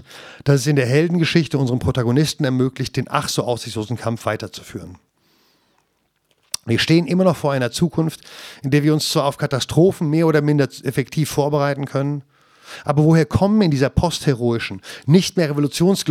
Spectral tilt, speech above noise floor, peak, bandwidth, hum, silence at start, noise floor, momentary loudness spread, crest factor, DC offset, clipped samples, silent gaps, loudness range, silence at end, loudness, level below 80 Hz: -6 dB/octave; 49 dB; -2 dBFS; 15.5 kHz; none; 0.1 s; -67 dBFS; 12 LU; 18 dB; under 0.1%; under 0.1%; none; 6 LU; 0 s; -19 LUFS; -44 dBFS